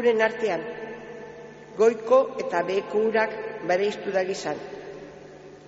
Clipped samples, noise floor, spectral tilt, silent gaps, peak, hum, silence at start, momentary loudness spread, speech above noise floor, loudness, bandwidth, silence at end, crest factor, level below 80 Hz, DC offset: under 0.1%; -45 dBFS; -3 dB/octave; none; -8 dBFS; 50 Hz at -55 dBFS; 0 s; 20 LU; 21 dB; -25 LUFS; 8 kHz; 0 s; 18 dB; -66 dBFS; under 0.1%